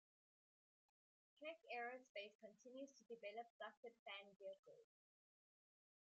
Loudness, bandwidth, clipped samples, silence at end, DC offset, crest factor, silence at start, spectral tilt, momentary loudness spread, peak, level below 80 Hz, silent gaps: -57 LUFS; 7.4 kHz; under 0.1%; 1.3 s; under 0.1%; 20 dB; 1.35 s; 0 dB/octave; 9 LU; -40 dBFS; under -90 dBFS; 2.09-2.15 s, 2.35-2.39 s, 3.50-3.60 s, 3.77-3.83 s, 3.99-4.06 s, 4.59-4.63 s